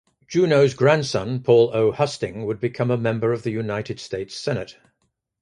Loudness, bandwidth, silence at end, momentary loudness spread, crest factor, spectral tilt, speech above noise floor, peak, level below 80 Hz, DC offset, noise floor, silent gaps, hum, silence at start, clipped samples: -21 LUFS; 10.5 kHz; 0.7 s; 12 LU; 20 dB; -6 dB/octave; 52 dB; -2 dBFS; -56 dBFS; under 0.1%; -72 dBFS; none; none; 0.3 s; under 0.1%